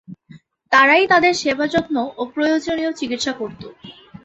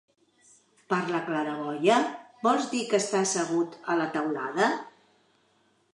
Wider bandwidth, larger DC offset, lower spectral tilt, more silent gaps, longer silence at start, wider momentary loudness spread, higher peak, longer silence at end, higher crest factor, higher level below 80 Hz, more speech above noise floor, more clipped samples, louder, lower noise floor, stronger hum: second, 8.2 kHz vs 11 kHz; neither; about the same, -3.5 dB/octave vs -4 dB/octave; neither; second, 0.1 s vs 0.9 s; first, 16 LU vs 7 LU; first, 0 dBFS vs -8 dBFS; second, 0.35 s vs 1.05 s; about the same, 18 dB vs 20 dB; first, -56 dBFS vs -82 dBFS; second, 29 dB vs 41 dB; neither; first, -17 LUFS vs -27 LUFS; second, -46 dBFS vs -67 dBFS; neither